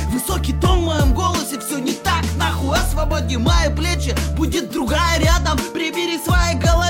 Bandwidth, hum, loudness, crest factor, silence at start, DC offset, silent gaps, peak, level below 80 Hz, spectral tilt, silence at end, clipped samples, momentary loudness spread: 17 kHz; none; -19 LUFS; 12 dB; 0 s; under 0.1%; none; -6 dBFS; -22 dBFS; -4.5 dB/octave; 0 s; under 0.1%; 5 LU